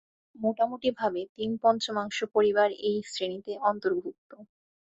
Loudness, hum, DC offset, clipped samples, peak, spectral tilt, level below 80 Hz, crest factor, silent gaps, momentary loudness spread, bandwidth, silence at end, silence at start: -28 LUFS; none; under 0.1%; under 0.1%; -10 dBFS; -4.5 dB/octave; -72 dBFS; 18 dB; 1.29-1.36 s, 4.18-4.30 s; 9 LU; 8.2 kHz; 0.5 s; 0.35 s